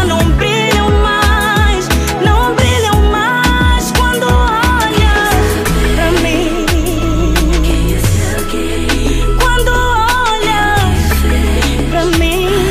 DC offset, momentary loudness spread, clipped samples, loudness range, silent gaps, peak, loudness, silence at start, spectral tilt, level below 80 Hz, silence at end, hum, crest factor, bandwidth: under 0.1%; 4 LU; under 0.1%; 2 LU; none; 0 dBFS; -12 LUFS; 0 s; -4.5 dB/octave; -16 dBFS; 0 s; none; 10 dB; 15.5 kHz